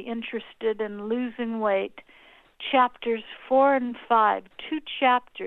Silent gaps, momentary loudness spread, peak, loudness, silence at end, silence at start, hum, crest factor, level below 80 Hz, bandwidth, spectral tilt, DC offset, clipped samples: none; 11 LU; -8 dBFS; -25 LUFS; 0 s; 0 s; none; 18 dB; -66 dBFS; 4.2 kHz; -7 dB/octave; under 0.1%; under 0.1%